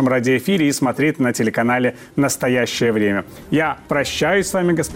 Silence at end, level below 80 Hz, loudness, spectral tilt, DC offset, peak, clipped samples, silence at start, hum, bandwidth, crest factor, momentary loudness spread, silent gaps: 0 s; -48 dBFS; -18 LUFS; -5 dB/octave; under 0.1%; -8 dBFS; under 0.1%; 0 s; none; 17 kHz; 10 dB; 4 LU; none